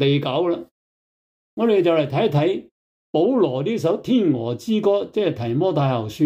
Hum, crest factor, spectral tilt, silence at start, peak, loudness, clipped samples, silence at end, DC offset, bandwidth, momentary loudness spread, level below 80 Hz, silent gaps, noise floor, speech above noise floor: none; 14 dB; -7.5 dB/octave; 0 s; -6 dBFS; -20 LUFS; under 0.1%; 0 s; under 0.1%; 15.5 kHz; 6 LU; -62 dBFS; 0.71-1.57 s, 2.71-3.13 s; under -90 dBFS; over 71 dB